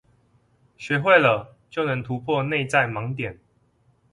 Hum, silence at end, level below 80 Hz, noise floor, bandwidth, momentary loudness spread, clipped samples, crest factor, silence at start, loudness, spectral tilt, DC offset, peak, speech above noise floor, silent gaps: none; 0.8 s; -58 dBFS; -63 dBFS; 11.5 kHz; 15 LU; under 0.1%; 20 dB; 0.8 s; -22 LUFS; -6 dB/octave; under 0.1%; -4 dBFS; 41 dB; none